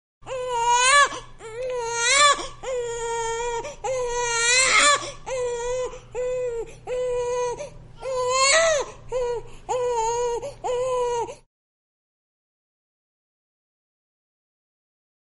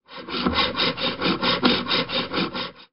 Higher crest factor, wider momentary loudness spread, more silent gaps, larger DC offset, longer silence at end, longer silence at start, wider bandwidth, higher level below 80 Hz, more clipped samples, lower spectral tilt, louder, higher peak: about the same, 20 dB vs 20 dB; first, 16 LU vs 7 LU; neither; second, under 0.1% vs 0.4%; first, 3.9 s vs 0.05 s; first, 0.25 s vs 0.1 s; first, 11.5 kHz vs 5.6 kHz; about the same, -46 dBFS vs -48 dBFS; neither; second, 0 dB/octave vs -1.5 dB/octave; about the same, -22 LUFS vs -22 LUFS; about the same, -4 dBFS vs -4 dBFS